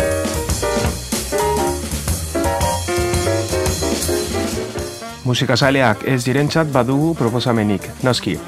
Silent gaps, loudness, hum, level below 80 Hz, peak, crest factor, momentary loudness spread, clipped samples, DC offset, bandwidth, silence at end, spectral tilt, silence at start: none; -18 LUFS; none; -32 dBFS; 0 dBFS; 18 dB; 6 LU; under 0.1%; under 0.1%; 16 kHz; 0 s; -4.5 dB/octave; 0 s